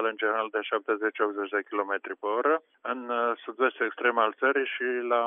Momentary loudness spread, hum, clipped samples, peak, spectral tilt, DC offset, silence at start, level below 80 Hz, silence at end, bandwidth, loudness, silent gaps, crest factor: 6 LU; none; under 0.1%; -10 dBFS; 0.5 dB/octave; under 0.1%; 0 s; under -90 dBFS; 0 s; 3.8 kHz; -28 LUFS; none; 18 dB